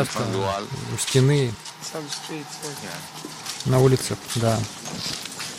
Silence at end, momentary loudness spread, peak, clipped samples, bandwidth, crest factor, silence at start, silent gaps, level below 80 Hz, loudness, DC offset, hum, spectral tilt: 0 s; 14 LU; -6 dBFS; under 0.1%; 16 kHz; 18 dB; 0 s; none; -52 dBFS; -24 LUFS; under 0.1%; none; -5 dB/octave